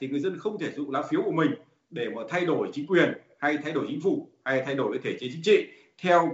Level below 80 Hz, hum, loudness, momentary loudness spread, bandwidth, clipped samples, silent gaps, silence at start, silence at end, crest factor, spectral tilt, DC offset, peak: -74 dBFS; none; -27 LUFS; 10 LU; 8 kHz; under 0.1%; none; 0 s; 0 s; 20 dB; -4 dB/octave; under 0.1%; -6 dBFS